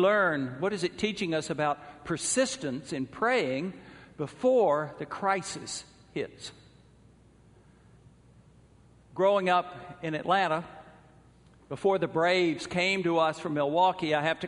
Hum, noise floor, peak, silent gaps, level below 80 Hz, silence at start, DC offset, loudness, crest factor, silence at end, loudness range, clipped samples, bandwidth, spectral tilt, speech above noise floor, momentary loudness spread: none; -58 dBFS; -12 dBFS; none; -64 dBFS; 0 s; under 0.1%; -28 LUFS; 18 dB; 0 s; 9 LU; under 0.1%; 10.5 kHz; -4 dB/octave; 30 dB; 14 LU